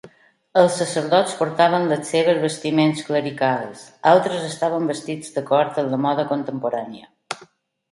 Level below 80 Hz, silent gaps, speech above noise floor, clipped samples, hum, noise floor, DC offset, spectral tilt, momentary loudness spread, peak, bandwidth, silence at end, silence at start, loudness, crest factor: -68 dBFS; none; 33 dB; under 0.1%; none; -52 dBFS; under 0.1%; -5 dB/octave; 11 LU; 0 dBFS; 11.5 kHz; 0.45 s; 0.05 s; -20 LUFS; 20 dB